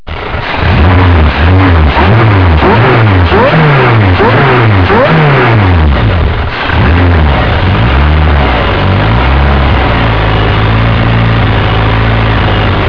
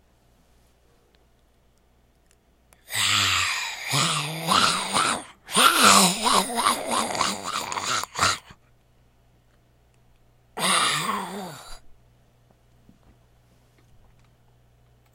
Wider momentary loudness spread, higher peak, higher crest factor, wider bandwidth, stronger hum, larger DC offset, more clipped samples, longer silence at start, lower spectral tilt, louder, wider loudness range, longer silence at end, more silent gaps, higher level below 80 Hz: second, 3 LU vs 15 LU; about the same, 0 dBFS vs -2 dBFS; second, 6 dB vs 24 dB; second, 5.4 kHz vs 16.5 kHz; neither; first, 4% vs under 0.1%; first, 0.7% vs under 0.1%; second, 0.05 s vs 2.9 s; first, -8.5 dB/octave vs -1.5 dB/octave; first, -7 LUFS vs -21 LUFS; second, 3 LU vs 10 LU; second, 0 s vs 3.25 s; neither; first, -12 dBFS vs -58 dBFS